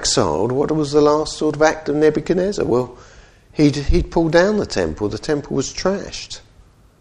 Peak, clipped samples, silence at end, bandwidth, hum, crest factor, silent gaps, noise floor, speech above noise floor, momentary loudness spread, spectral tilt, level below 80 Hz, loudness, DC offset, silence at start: 0 dBFS; under 0.1%; 0.6 s; 10.5 kHz; none; 18 dB; none; -49 dBFS; 32 dB; 11 LU; -5 dB/octave; -32 dBFS; -18 LUFS; under 0.1%; 0 s